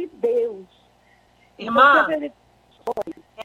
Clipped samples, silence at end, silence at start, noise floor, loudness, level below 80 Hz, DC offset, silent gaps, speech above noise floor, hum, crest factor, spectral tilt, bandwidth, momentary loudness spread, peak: under 0.1%; 0 s; 0 s; -57 dBFS; -19 LUFS; -62 dBFS; under 0.1%; none; 39 dB; 60 Hz at -55 dBFS; 20 dB; -4.5 dB/octave; 15.5 kHz; 21 LU; -2 dBFS